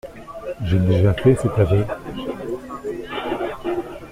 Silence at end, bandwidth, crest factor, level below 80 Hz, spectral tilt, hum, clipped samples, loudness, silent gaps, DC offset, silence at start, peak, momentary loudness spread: 0 s; 12 kHz; 18 dB; -40 dBFS; -8 dB/octave; none; under 0.1%; -21 LUFS; none; under 0.1%; 0.05 s; -2 dBFS; 13 LU